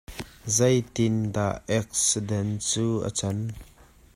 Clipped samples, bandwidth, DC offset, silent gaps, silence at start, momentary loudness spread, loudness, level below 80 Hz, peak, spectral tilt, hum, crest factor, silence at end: under 0.1%; 15.5 kHz; under 0.1%; none; 0.1 s; 12 LU; -25 LUFS; -52 dBFS; -8 dBFS; -4.5 dB/octave; none; 18 dB; 0.5 s